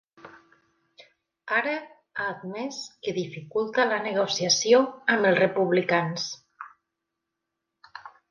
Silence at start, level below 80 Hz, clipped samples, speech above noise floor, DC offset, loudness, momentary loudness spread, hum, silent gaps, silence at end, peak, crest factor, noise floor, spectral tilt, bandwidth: 0.25 s; -74 dBFS; under 0.1%; 59 dB; under 0.1%; -25 LUFS; 24 LU; none; none; 0.2 s; -8 dBFS; 20 dB; -84 dBFS; -3.5 dB/octave; 10.5 kHz